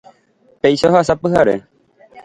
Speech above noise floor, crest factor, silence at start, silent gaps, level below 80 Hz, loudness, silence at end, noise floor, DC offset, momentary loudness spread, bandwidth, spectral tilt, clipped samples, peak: 41 dB; 16 dB; 0.65 s; none; -46 dBFS; -15 LUFS; 0.05 s; -55 dBFS; under 0.1%; 5 LU; 11 kHz; -6 dB/octave; under 0.1%; 0 dBFS